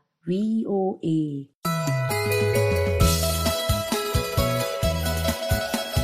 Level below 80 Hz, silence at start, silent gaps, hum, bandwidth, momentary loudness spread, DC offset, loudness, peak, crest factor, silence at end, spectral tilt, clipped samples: -34 dBFS; 0.25 s; 1.55-1.61 s; none; 15.5 kHz; 5 LU; under 0.1%; -24 LUFS; -6 dBFS; 16 dB; 0 s; -5 dB/octave; under 0.1%